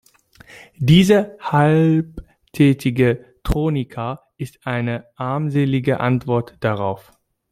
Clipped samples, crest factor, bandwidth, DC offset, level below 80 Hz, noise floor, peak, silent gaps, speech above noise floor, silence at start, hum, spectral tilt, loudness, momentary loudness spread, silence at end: under 0.1%; 18 dB; 15 kHz; under 0.1%; -38 dBFS; -48 dBFS; -2 dBFS; none; 31 dB; 0.55 s; none; -7 dB/octave; -19 LUFS; 14 LU; 0.5 s